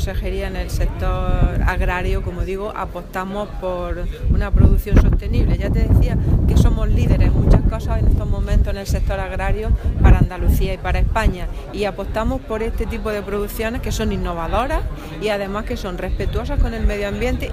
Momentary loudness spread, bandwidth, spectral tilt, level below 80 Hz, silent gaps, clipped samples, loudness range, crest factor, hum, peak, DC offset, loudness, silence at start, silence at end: 9 LU; 15.5 kHz; -7 dB/octave; -20 dBFS; none; under 0.1%; 6 LU; 16 dB; none; 0 dBFS; under 0.1%; -20 LUFS; 0 s; 0 s